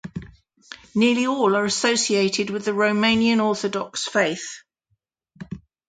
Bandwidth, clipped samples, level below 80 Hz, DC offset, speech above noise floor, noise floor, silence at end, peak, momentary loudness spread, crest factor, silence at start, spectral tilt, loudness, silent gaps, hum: 9.4 kHz; under 0.1%; -58 dBFS; under 0.1%; 52 dB; -73 dBFS; 0.3 s; -6 dBFS; 20 LU; 18 dB; 0.05 s; -3.5 dB/octave; -21 LUFS; none; none